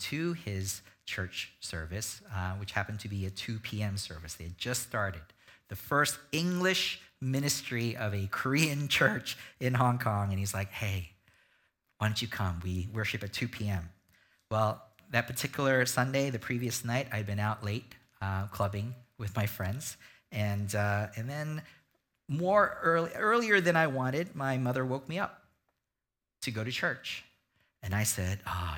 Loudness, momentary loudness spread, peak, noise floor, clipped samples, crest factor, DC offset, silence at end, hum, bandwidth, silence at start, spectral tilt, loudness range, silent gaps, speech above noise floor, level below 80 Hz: -32 LUFS; 12 LU; -10 dBFS; -89 dBFS; under 0.1%; 24 dB; under 0.1%; 0 s; none; 18 kHz; 0 s; -4.5 dB/octave; 7 LU; none; 57 dB; -58 dBFS